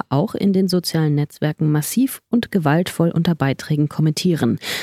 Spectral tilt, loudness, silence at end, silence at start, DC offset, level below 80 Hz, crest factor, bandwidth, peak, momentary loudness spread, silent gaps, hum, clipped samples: -6 dB/octave; -19 LUFS; 0 s; 0.1 s; under 0.1%; -56 dBFS; 14 dB; 16 kHz; -4 dBFS; 3 LU; none; none; under 0.1%